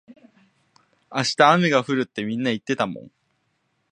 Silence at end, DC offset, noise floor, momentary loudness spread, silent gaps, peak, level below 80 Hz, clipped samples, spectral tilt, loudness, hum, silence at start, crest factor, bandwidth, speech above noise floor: 0.85 s; under 0.1%; -71 dBFS; 12 LU; none; 0 dBFS; -68 dBFS; under 0.1%; -5 dB/octave; -21 LUFS; none; 0.1 s; 22 dB; 10 kHz; 50 dB